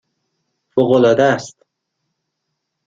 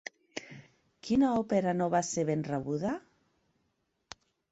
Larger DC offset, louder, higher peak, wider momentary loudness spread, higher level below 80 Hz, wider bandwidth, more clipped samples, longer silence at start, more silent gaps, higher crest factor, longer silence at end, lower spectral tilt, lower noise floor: neither; first, -15 LUFS vs -30 LUFS; first, -2 dBFS vs -16 dBFS; second, 11 LU vs 24 LU; first, -58 dBFS vs -66 dBFS; about the same, 7.8 kHz vs 8.2 kHz; neither; first, 0.75 s vs 0.35 s; neither; about the same, 18 dB vs 18 dB; second, 1.4 s vs 1.55 s; about the same, -6 dB/octave vs -5.5 dB/octave; about the same, -75 dBFS vs -78 dBFS